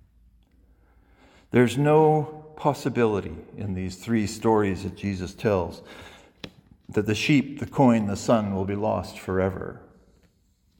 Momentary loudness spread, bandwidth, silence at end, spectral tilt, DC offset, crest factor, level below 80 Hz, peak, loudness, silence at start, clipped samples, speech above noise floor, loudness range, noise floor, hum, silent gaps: 18 LU; 17 kHz; 1 s; -6.5 dB/octave; under 0.1%; 20 dB; -56 dBFS; -6 dBFS; -24 LUFS; 1.55 s; under 0.1%; 41 dB; 4 LU; -65 dBFS; none; none